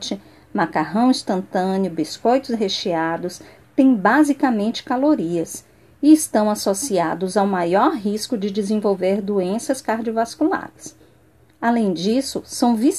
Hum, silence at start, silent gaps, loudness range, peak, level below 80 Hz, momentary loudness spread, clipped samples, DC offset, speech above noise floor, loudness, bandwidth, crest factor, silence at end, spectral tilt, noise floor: none; 0 s; none; 4 LU; -2 dBFS; -60 dBFS; 11 LU; under 0.1%; 0.1%; 35 dB; -20 LUFS; 14 kHz; 18 dB; 0 s; -5 dB/octave; -54 dBFS